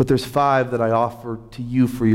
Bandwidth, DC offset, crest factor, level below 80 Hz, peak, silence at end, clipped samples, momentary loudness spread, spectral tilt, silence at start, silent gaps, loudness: 16.5 kHz; under 0.1%; 12 dB; -46 dBFS; -6 dBFS; 0 s; under 0.1%; 13 LU; -7 dB/octave; 0 s; none; -20 LUFS